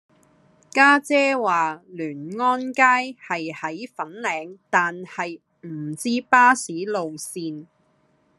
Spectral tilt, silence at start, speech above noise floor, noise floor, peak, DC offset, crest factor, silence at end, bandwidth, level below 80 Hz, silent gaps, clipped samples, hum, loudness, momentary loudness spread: -3.5 dB/octave; 0.75 s; 42 dB; -63 dBFS; -2 dBFS; under 0.1%; 22 dB; 0.75 s; 13 kHz; -78 dBFS; none; under 0.1%; none; -21 LUFS; 17 LU